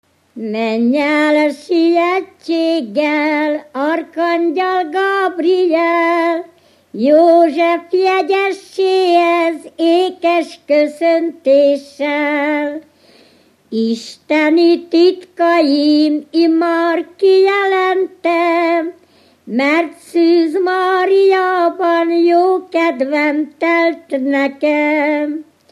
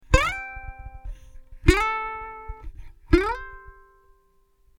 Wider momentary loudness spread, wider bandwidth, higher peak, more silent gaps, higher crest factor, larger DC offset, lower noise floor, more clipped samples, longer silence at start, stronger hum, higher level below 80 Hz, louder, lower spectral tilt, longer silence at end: second, 8 LU vs 22 LU; second, 11.5 kHz vs 18 kHz; about the same, -2 dBFS vs -2 dBFS; neither; second, 12 dB vs 26 dB; neither; second, -50 dBFS vs -62 dBFS; neither; first, 0.35 s vs 0.1 s; neither; second, -74 dBFS vs -32 dBFS; first, -14 LUFS vs -24 LUFS; about the same, -4.5 dB/octave vs -5.5 dB/octave; second, 0.3 s vs 1.1 s